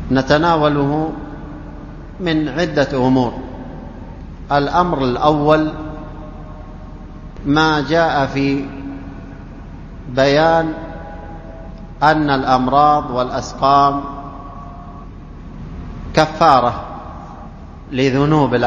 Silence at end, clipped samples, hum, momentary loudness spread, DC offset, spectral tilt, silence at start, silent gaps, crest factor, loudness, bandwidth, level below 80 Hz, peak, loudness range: 0 s; under 0.1%; none; 22 LU; under 0.1%; -6.5 dB/octave; 0 s; none; 18 dB; -15 LUFS; 7.4 kHz; -34 dBFS; 0 dBFS; 4 LU